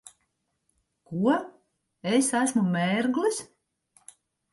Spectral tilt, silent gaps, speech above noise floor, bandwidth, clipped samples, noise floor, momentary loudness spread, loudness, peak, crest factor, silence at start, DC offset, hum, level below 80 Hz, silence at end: -4.5 dB/octave; none; 52 dB; 11.5 kHz; under 0.1%; -76 dBFS; 12 LU; -26 LUFS; -10 dBFS; 18 dB; 1.1 s; under 0.1%; none; -72 dBFS; 1.1 s